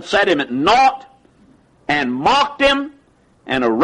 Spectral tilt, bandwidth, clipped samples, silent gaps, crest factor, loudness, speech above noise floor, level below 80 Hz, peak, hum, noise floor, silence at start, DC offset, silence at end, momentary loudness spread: -4 dB/octave; 11 kHz; under 0.1%; none; 14 dB; -16 LUFS; 38 dB; -48 dBFS; -4 dBFS; none; -53 dBFS; 0 s; under 0.1%; 0 s; 13 LU